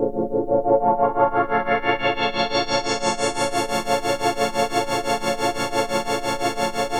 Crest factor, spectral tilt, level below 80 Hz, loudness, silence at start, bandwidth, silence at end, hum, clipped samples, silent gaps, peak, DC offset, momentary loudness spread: 16 dB; -3.5 dB/octave; -44 dBFS; -22 LUFS; 0 s; 17.5 kHz; 0 s; none; under 0.1%; none; -4 dBFS; under 0.1%; 4 LU